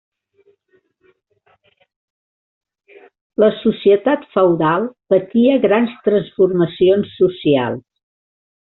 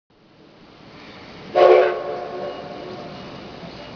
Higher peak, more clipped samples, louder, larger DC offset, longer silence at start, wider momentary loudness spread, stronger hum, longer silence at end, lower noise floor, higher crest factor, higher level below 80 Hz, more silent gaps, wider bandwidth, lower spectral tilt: about the same, -2 dBFS vs 0 dBFS; neither; about the same, -16 LUFS vs -18 LUFS; neither; first, 3.4 s vs 0.95 s; second, 4 LU vs 26 LU; neither; first, 0.85 s vs 0 s; first, -61 dBFS vs -50 dBFS; second, 16 dB vs 22 dB; about the same, -58 dBFS vs -58 dBFS; neither; second, 4.1 kHz vs 5.4 kHz; about the same, -5.5 dB/octave vs -6 dB/octave